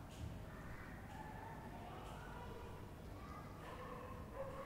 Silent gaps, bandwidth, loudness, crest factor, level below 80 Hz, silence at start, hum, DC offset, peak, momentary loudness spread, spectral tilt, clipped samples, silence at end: none; 16 kHz; -53 LUFS; 16 dB; -60 dBFS; 0 s; none; under 0.1%; -36 dBFS; 2 LU; -6 dB/octave; under 0.1%; 0 s